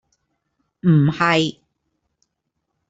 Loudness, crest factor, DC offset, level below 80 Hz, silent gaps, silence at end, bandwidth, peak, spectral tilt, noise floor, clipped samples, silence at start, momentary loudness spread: -18 LUFS; 20 dB; under 0.1%; -58 dBFS; none; 1.4 s; 8 kHz; -2 dBFS; -6.5 dB/octave; -76 dBFS; under 0.1%; 0.85 s; 7 LU